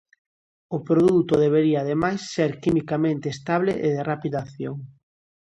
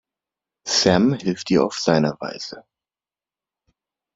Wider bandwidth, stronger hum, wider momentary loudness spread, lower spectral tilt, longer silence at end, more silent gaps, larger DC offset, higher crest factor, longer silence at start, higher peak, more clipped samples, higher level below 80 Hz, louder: first, 11 kHz vs 7.8 kHz; neither; about the same, 14 LU vs 16 LU; first, -7 dB/octave vs -4.5 dB/octave; second, 0.55 s vs 1.55 s; neither; neither; second, 16 dB vs 22 dB; about the same, 0.7 s vs 0.65 s; second, -8 dBFS vs -2 dBFS; neither; about the same, -56 dBFS vs -56 dBFS; second, -23 LUFS vs -20 LUFS